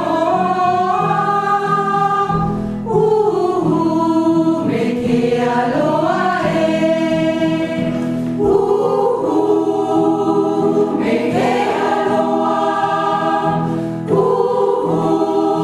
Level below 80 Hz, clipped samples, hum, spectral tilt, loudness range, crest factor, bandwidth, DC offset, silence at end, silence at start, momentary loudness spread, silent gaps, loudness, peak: -46 dBFS; under 0.1%; none; -7 dB/octave; 1 LU; 14 dB; 12 kHz; under 0.1%; 0 s; 0 s; 3 LU; none; -16 LUFS; -2 dBFS